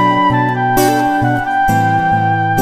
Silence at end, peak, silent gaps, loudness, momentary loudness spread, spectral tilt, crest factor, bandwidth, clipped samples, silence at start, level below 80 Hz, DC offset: 0 s; 0 dBFS; none; -13 LUFS; 2 LU; -5.5 dB/octave; 12 dB; 15.5 kHz; under 0.1%; 0 s; -38 dBFS; under 0.1%